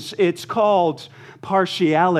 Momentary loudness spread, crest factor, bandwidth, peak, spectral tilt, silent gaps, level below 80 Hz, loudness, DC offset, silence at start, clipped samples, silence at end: 18 LU; 16 dB; 14 kHz; -4 dBFS; -6 dB/octave; none; -68 dBFS; -19 LUFS; under 0.1%; 0 s; under 0.1%; 0 s